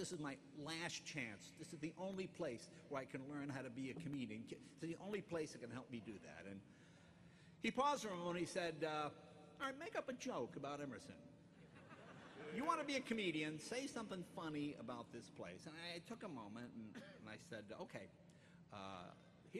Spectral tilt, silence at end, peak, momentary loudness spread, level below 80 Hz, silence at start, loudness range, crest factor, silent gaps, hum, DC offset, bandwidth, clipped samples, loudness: -4.5 dB/octave; 0 s; -26 dBFS; 19 LU; -80 dBFS; 0 s; 8 LU; 22 dB; none; none; under 0.1%; 13 kHz; under 0.1%; -48 LUFS